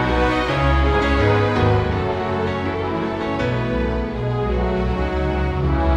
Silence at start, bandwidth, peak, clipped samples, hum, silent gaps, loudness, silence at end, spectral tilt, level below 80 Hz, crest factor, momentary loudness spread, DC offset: 0 s; 8.4 kHz; -6 dBFS; under 0.1%; none; none; -20 LUFS; 0 s; -7.5 dB/octave; -26 dBFS; 14 dB; 6 LU; under 0.1%